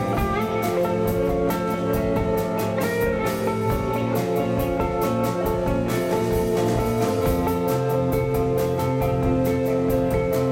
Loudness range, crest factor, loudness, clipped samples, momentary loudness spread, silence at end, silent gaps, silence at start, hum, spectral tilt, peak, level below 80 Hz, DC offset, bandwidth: 1 LU; 14 dB; -23 LUFS; under 0.1%; 2 LU; 0 s; none; 0 s; none; -7 dB/octave; -8 dBFS; -36 dBFS; under 0.1%; 16.5 kHz